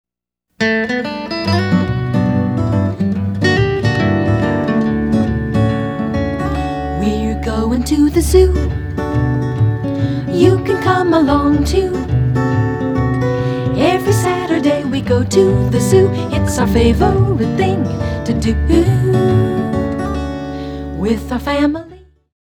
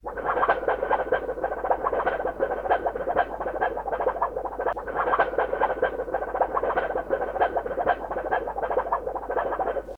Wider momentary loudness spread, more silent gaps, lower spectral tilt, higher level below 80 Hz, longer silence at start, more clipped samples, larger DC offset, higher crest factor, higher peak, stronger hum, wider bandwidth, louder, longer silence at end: about the same, 7 LU vs 5 LU; neither; about the same, -7 dB/octave vs -6.5 dB/octave; first, -26 dBFS vs -46 dBFS; first, 0.6 s vs 0.05 s; neither; neither; second, 14 dB vs 20 dB; first, 0 dBFS vs -6 dBFS; neither; first, 18 kHz vs 5.2 kHz; first, -15 LUFS vs -26 LUFS; first, 0.5 s vs 0 s